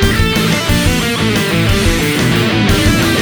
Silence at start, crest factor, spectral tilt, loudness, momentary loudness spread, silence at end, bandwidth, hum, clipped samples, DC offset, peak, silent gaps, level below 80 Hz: 0 s; 12 dB; -4.5 dB/octave; -12 LUFS; 2 LU; 0 s; over 20 kHz; none; under 0.1%; under 0.1%; 0 dBFS; none; -22 dBFS